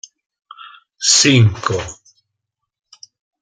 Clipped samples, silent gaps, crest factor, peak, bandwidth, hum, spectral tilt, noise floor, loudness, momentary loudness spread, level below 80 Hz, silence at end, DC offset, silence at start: under 0.1%; none; 18 dB; 0 dBFS; 9.6 kHz; none; -3.5 dB/octave; -78 dBFS; -13 LUFS; 14 LU; -52 dBFS; 1.5 s; under 0.1%; 0.6 s